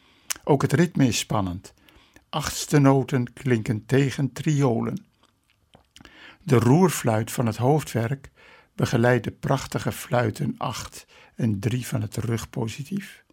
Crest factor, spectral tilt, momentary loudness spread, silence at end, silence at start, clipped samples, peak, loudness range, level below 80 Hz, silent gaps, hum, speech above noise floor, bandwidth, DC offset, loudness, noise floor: 22 dB; -6 dB/octave; 13 LU; 0.2 s; 0.3 s; under 0.1%; -2 dBFS; 4 LU; -54 dBFS; none; none; 41 dB; 16.5 kHz; under 0.1%; -24 LUFS; -64 dBFS